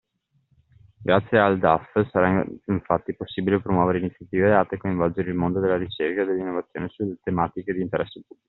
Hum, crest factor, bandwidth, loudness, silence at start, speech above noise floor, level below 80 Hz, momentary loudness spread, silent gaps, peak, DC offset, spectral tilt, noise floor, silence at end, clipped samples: none; 22 dB; 4.2 kHz; -23 LUFS; 1 s; 45 dB; -56 dBFS; 10 LU; none; -2 dBFS; under 0.1%; -6 dB/octave; -68 dBFS; 0.25 s; under 0.1%